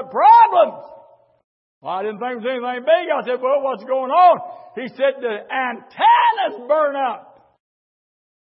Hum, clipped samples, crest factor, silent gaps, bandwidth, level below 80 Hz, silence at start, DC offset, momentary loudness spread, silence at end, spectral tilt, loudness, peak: none; under 0.1%; 16 dB; 1.44-1.81 s; 5.6 kHz; -82 dBFS; 0 s; under 0.1%; 16 LU; 1.35 s; -8.5 dB/octave; -17 LUFS; -2 dBFS